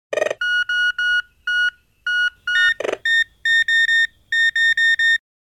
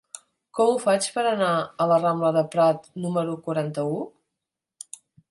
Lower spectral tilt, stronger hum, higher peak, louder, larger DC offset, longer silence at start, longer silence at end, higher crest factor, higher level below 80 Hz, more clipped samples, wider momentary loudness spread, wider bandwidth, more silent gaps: second, 0.5 dB/octave vs -5 dB/octave; neither; about the same, -6 dBFS vs -8 dBFS; first, -17 LUFS vs -23 LUFS; neither; about the same, 0.1 s vs 0.15 s; second, 0.3 s vs 1.2 s; about the same, 14 dB vs 16 dB; first, -58 dBFS vs -74 dBFS; neither; second, 7 LU vs 20 LU; first, 13.5 kHz vs 11.5 kHz; neither